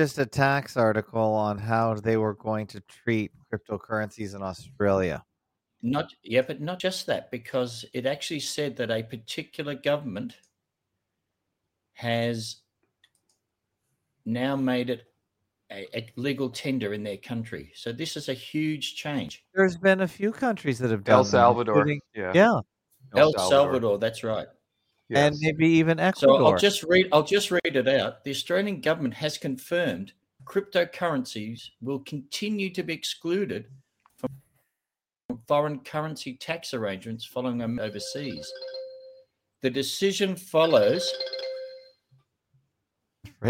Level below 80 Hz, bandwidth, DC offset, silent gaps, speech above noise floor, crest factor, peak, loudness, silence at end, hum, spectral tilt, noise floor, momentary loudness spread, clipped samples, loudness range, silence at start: -64 dBFS; 16.5 kHz; under 0.1%; 35.25-35.29 s; over 64 dB; 24 dB; -2 dBFS; -26 LUFS; 0 s; none; -5 dB/octave; under -90 dBFS; 16 LU; under 0.1%; 11 LU; 0 s